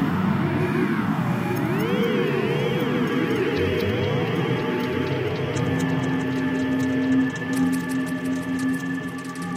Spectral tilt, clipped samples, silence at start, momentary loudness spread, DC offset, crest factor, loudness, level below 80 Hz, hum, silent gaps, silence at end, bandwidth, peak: -6.5 dB/octave; under 0.1%; 0 s; 4 LU; under 0.1%; 12 dB; -24 LUFS; -54 dBFS; none; none; 0 s; 16 kHz; -10 dBFS